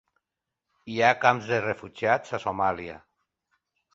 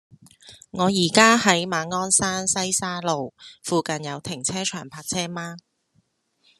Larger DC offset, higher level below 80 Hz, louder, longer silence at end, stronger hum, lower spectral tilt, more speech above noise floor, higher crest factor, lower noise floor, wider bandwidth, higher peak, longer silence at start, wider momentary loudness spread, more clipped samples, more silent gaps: neither; about the same, -62 dBFS vs -62 dBFS; second, -25 LUFS vs -21 LUFS; about the same, 0.95 s vs 1 s; neither; first, -5 dB/octave vs -3 dB/octave; first, 61 dB vs 44 dB; about the same, 24 dB vs 24 dB; first, -86 dBFS vs -67 dBFS; second, 7.8 kHz vs 13 kHz; second, -4 dBFS vs 0 dBFS; first, 0.85 s vs 0.45 s; second, 14 LU vs 18 LU; neither; neither